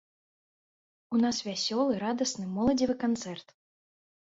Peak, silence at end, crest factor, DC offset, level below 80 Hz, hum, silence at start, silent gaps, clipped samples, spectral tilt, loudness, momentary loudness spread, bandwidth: -14 dBFS; 0.8 s; 16 dB; under 0.1%; -62 dBFS; none; 1.1 s; none; under 0.1%; -4 dB/octave; -29 LUFS; 6 LU; 8 kHz